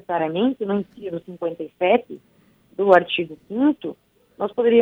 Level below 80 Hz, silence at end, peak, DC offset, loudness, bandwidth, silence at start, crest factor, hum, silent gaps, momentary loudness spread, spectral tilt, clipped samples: -66 dBFS; 0 s; -2 dBFS; under 0.1%; -22 LUFS; 5 kHz; 0.1 s; 20 dB; none; none; 16 LU; -7.5 dB/octave; under 0.1%